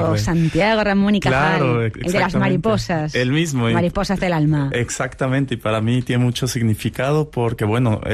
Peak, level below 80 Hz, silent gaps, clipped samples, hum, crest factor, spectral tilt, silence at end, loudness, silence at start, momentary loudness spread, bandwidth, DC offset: -6 dBFS; -38 dBFS; none; under 0.1%; none; 12 dB; -6 dB/octave; 0 s; -19 LUFS; 0 s; 4 LU; 14 kHz; under 0.1%